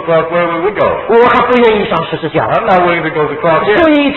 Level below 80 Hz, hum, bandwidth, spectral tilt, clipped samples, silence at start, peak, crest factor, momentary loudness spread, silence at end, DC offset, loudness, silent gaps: -40 dBFS; none; 6 kHz; -8 dB/octave; 0.2%; 0 s; 0 dBFS; 10 dB; 7 LU; 0 s; under 0.1%; -10 LUFS; none